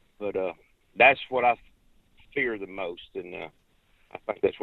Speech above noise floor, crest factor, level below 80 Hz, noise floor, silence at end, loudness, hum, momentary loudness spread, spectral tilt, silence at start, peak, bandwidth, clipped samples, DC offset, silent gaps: 36 dB; 24 dB; -62 dBFS; -63 dBFS; 0.05 s; -26 LUFS; none; 21 LU; -6.5 dB/octave; 0.2 s; -6 dBFS; 4.3 kHz; under 0.1%; under 0.1%; none